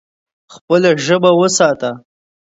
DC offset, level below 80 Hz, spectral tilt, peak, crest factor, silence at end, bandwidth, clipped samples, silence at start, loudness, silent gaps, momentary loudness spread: under 0.1%; -62 dBFS; -4 dB/octave; 0 dBFS; 14 dB; 0.45 s; 8 kHz; under 0.1%; 0.55 s; -13 LUFS; 0.61-0.68 s; 11 LU